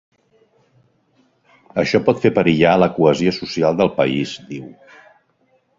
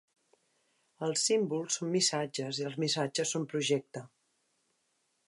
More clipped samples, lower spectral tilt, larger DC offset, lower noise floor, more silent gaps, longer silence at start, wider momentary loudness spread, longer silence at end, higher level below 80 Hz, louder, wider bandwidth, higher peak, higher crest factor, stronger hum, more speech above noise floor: neither; first, -6.5 dB/octave vs -3.5 dB/octave; neither; second, -61 dBFS vs -77 dBFS; neither; first, 1.75 s vs 1 s; first, 16 LU vs 7 LU; second, 1.05 s vs 1.2 s; first, -52 dBFS vs -86 dBFS; first, -17 LUFS vs -31 LUFS; second, 7.8 kHz vs 11.5 kHz; first, -2 dBFS vs -16 dBFS; about the same, 18 dB vs 18 dB; neither; about the same, 45 dB vs 45 dB